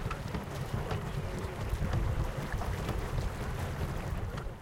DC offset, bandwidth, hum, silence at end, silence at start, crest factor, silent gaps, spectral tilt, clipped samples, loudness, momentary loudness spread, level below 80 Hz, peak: under 0.1%; 17 kHz; none; 0 s; 0 s; 16 dB; none; -6 dB/octave; under 0.1%; -36 LUFS; 5 LU; -38 dBFS; -20 dBFS